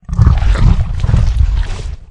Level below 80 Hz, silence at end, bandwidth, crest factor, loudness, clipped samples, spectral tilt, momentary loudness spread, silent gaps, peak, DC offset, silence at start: -12 dBFS; 0.05 s; 9 kHz; 12 dB; -14 LUFS; 0.4%; -7.5 dB/octave; 9 LU; none; 0 dBFS; under 0.1%; 0.1 s